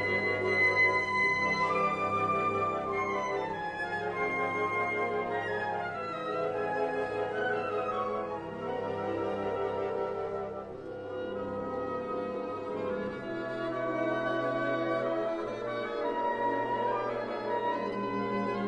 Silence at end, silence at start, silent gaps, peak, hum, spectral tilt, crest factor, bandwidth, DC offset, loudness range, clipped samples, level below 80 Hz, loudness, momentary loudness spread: 0 s; 0 s; none; -16 dBFS; none; -6 dB/octave; 16 dB; 10 kHz; under 0.1%; 7 LU; under 0.1%; -64 dBFS; -31 LUFS; 9 LU